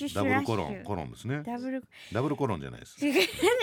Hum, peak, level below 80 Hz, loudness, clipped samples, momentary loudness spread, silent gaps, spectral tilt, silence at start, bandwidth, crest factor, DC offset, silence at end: none; -10 dBFS; -60 dBFS; -30 LUFS; under 0.1%; 11 LU; none; -5 dB/octave; 0 s; 17.5 kHz; 20 dB; under 0.1%; 0 s